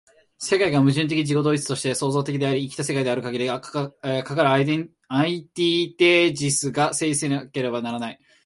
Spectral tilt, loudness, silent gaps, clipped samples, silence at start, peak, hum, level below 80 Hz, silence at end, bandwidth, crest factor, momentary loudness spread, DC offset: -4.5 dB/octave; -22 LUFS; none; under 0.1%; 0.4 s; -4 dBFS; none; -64 dBFS; 0.3 s; 11.5 kHz; 18 dB; 9 LU; under 0.1%